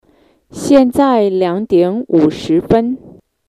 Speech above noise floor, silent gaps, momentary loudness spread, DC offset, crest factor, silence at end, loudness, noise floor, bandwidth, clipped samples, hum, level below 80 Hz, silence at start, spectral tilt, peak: 40 dB; none; 8 LU; under 0.1%; 14 dB; 0.4 s; -13 LUFS; -51 dBFS; 13.5 kHz; under 0.1%; none; -44 dBFS; 0.55 s; -6.5 dB/octave; 0 dBFS